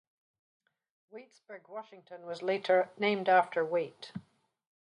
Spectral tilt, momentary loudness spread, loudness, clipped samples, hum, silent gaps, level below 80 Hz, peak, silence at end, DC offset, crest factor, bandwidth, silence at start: -5.5 dB/octave; 24 LU; -30 LUFS; under 0.1%; none; none; -82 dBFS; -12 dBFS; 0.65 s; under 0.1%; 22 dB; 10 kHz; 1.15 s